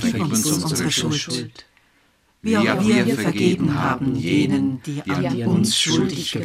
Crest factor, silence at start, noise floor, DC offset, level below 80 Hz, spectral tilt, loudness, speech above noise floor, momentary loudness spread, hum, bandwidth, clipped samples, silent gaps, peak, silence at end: 18 dB; 0 s; -60 dBFS; under 0.1%; -52 dBFS; -4.5 dB/octave; -20 LUFS; 40 dB; 8 LU; none; 16 kHz; under 0.1%; none; -2 dBFS; 0 s